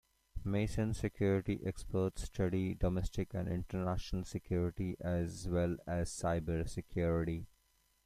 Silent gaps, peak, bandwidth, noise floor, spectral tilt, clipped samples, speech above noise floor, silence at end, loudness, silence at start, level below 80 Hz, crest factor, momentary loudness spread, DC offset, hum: none; -20 dBFS; 14.5 kHz; -74 dBFS; -7 dB/octave; under 0.1%; 38 dB; 0.6 s; -38 LUFS; 0.35 s; -48 dBFS; 16 dB; 6 LU; under 0.1%; none